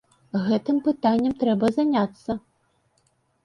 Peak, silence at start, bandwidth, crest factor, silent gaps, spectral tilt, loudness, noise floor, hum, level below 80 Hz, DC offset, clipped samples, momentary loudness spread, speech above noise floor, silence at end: -8 dBFS; 0.35 s; 10.5 kHz; 16 dB; none; -7.5 dB/octave; -23 LUFS; -67 dBFS; none; -60 dBFS; under 0.1%; under 0.1%; 10 LU; 45 dB; 1.05 s